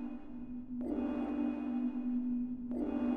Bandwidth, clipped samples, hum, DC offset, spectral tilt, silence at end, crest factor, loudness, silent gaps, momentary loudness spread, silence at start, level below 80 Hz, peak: 3.6 kHz; under 0.1%; none; 0.2%; -9 dB/octave; 0 s; 12 dB; -38 LUFS; none; 9 LU; 0 s; -58 dBFS; -24 dBFS